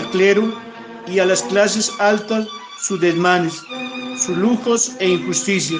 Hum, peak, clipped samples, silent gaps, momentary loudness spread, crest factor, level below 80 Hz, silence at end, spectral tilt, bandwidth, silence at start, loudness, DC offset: none; 0 dBFS; under 0.1%; none; 12 LU; 18 dB; -62 dBFS; 0 s; -3.5 dB/octave; 10.5 kHz; 0 s; -18 LUFS; under 0.1%